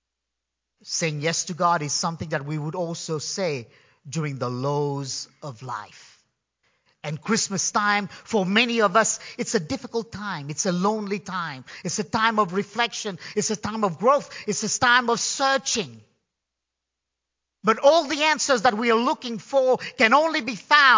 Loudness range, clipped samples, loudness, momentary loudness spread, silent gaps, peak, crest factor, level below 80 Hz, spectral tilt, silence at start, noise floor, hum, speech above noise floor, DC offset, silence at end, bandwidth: 7 LU; under 0.1%; -23 LUFS; 13 LU; none; 0 dBFS; 24 dB; -62 dBFS; -3 dB/octave; 0.85 s; -84 dBFS; none; 61 dB; under 0.1%; 0 s; 7.8 kHz